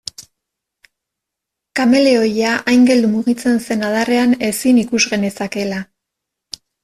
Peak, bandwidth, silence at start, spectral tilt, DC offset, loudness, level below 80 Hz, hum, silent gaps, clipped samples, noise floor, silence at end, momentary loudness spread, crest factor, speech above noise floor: -2 dBFS; 14 kHz; 0.2 s; -4 dB/octave; under 0.1%; -15 LUFS; -56 dBFS; none; none; under 0.1%; -81 dBFS; 1 s; 14 LU; 14 dB; 67 dB